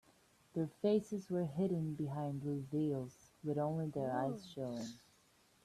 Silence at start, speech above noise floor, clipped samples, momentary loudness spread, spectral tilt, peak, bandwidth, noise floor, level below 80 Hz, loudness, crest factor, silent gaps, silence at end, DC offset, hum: 0.55 s; 32 dB; under 0.1%; 10 LU; -8 dB/octave; -24 dBFS; 13.5 kHz; -71 dBFS; -74 dBFS; -40 LUFS; 16 dB; none; 0.65 s; under 0.1%; none